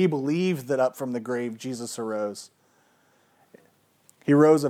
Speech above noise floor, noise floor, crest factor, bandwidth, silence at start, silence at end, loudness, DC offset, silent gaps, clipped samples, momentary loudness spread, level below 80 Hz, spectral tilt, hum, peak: 40 dB; -63 dBFS; 18 dB; 15.5 kHz; 0 s; 0 s; -26 LUFS; under 0.1%; none; under 0.1%; 13 LU; -86 dBFS; -6.5 dB/octave; none; -6 dBFS